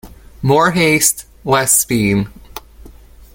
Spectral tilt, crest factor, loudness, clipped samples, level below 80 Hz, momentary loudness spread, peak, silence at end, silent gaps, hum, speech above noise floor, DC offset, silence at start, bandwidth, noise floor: -3.5 dB/octave; 16 dB; -13 LUFS; under 0.1%; -40 dBFS; 20 LU; 0 dBFS; 0.45 s; none; none; 26 dB; under 0.1%; 0.05 s; 17 kHz; -39 dBFS